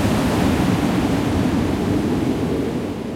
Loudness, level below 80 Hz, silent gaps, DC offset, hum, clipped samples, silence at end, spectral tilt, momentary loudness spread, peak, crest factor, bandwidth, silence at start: -20 LUFS; -34 dBFS; none; under 0.1%; none; under 0.1%; 0 s; -6.5 dB/octave; 4 LU; -6 dBFS; 12 dB; 16.5 kHz; 0 s